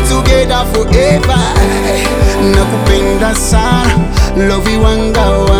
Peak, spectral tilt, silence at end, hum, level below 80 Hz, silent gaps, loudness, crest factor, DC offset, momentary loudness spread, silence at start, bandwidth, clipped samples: 0 dBFS; -5 dB/octave; 0 s; none; -14 dBFS; none; -10 LUFS; 10 dB; under 0.1%; 2 LU; 0 s; 16.5 kHz; 0.3%